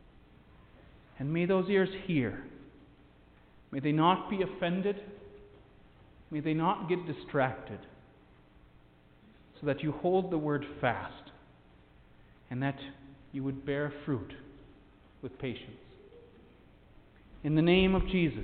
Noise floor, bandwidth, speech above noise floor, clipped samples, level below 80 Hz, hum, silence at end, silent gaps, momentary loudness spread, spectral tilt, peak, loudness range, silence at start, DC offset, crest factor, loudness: -60 dBFS; 4.5 kHz; 29 dB; under 0.1%; -52 dBFS; none; 0 s; none; 20 LU; -10.5 dB/octave; -14 dBFS; 7 LU; 1.15 s; under 0.1%; 20 dB; -32 LUFS